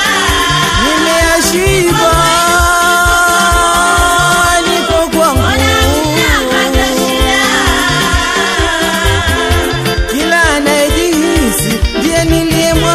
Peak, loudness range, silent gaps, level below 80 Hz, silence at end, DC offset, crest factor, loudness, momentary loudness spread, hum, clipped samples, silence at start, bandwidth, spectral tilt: 0 dBFS; 2 LU; none; -20 dBFS; 0 s; under 0.1%; 10 dB; -9 LUFS; 3 LU; none; under 0.1%; 0 s; 16 kHz; -3.5 dB/octave